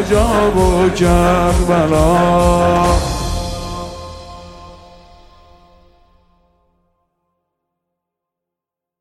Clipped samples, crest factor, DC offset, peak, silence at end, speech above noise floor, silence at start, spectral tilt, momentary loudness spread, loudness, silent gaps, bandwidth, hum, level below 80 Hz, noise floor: under 0.1%; 16 dB; under 0.1%; -2 dBFS; 4.25 s; 72 dB; 0 s; -6 dB/octave; 20 LU; -14 LUFS; none; 15.5 kHz; none; -26 dBFS; -84 dBFS